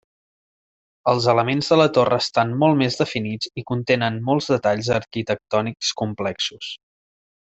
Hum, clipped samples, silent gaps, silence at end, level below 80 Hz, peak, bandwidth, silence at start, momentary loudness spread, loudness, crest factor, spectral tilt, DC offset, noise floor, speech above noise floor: none; under 0.1%; none; 0.75 s; -58 dBFS; -4 dBFS; 8.2 kHz; 1.05 s; 9 LU; -21 LUFS; 18 dB; -5 dB/octave; under 0.1%; under -90 dBFS; over 70 dB